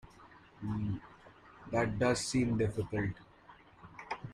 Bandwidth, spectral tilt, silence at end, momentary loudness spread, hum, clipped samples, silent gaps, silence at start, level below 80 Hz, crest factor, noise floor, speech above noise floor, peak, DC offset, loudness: 13.5 kHz; -5.5 dB/octave; 0 s; 21 LU; none; under 0.1%; none; 0.05 s; -58 dBFS; 18 dB; -59 dBFS; 26 dB; -18 dBFS; under 0.1%; -35 LUFS